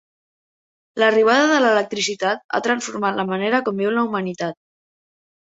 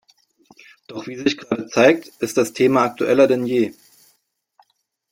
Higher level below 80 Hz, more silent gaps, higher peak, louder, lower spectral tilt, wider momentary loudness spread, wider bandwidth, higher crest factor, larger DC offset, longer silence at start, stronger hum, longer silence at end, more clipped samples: about the same, -68 dBFS vs -64 dBFS; first, 2.44-2.49 s vs none; about the same, -2 dBFS vs -2 dBFS; about the same, -19 LUFS vs -18 LUFS; about the same, -4 dB/octave vs -5 dB/octave; about the same, 10 LU vs 10 LU; second, 8 kHz vs 16.5 kHz; about the same, 18 dB vs 18 dB; neither; about the same, 0.95 s vs 0.9 s; neither; second, 0.9 s vs 1.4 s; neither